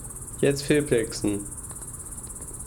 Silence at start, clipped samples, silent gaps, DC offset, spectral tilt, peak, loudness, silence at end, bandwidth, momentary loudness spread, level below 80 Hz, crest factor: 0 s; under 0.1%; none; under 0.1%; -4.5 dB/octave; -8 dBFS; -27 LUFS; 0 s; over 20 kHz; 13 LU; -46 dBFS; 20 dB